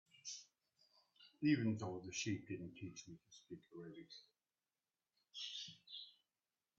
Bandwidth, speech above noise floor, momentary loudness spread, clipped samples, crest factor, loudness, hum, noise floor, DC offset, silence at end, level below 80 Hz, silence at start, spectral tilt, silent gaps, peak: 7.8 kHz; over 45 dB; 20 LU; under 0.1%; 24 dB; -45 LUFS; none; under -90 dBFS; under 0.1%; 0.65 s; -84 dBFS; 0.15 s; -5 dB/octave; none; -24 dBFS